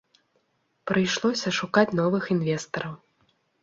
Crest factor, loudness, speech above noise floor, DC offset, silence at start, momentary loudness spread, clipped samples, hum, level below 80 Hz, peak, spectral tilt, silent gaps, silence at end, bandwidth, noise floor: 22 dB; -25 LUFS; 46 dB; under 0.1%; 0.85 s; 13 LU; under 0.1%; none; -64 dBFS; -6 dBFS; -5 dB/octave; none; 0.65 s; 8 kHz; -71 dBFS